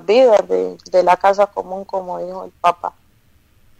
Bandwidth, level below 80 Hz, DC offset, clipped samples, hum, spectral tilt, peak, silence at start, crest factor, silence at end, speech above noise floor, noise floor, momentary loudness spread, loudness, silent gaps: 10 kHz; -56 dBFS; under 0.1%; under 0.1%; none; -4.5 dB/octave; -4 dBFS; 0.1 s; 14 dB; 0.9 s; 38 dB; -54 dBFS; 15 LU; -17 LUFS; none